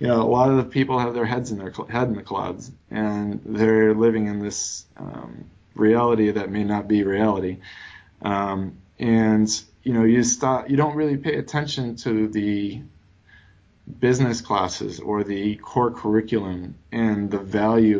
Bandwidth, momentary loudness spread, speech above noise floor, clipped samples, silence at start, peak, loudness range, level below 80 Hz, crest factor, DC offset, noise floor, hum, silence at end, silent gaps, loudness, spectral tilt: 8 kHz; 14 LU; 33 dB; under 0.1%; 0 s; -6 dBFS; 4 LU; -50 dBFS; 16 dB; under 0.1%; -54 dBFS; none; 0 s; none; -22 LUFS; -5.5 dB/octave